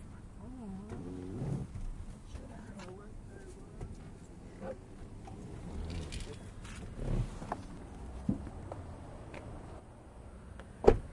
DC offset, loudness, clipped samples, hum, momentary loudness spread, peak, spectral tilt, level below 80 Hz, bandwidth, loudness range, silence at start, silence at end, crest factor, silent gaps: under 0.1%; -42 LUFS; under 0.1%; none; 13 LU; -6 dBFS; -7 dB/octave; -46 dBFS; 11.5 kHz; 7 LU; 0 s; 0 s; 34 dB; none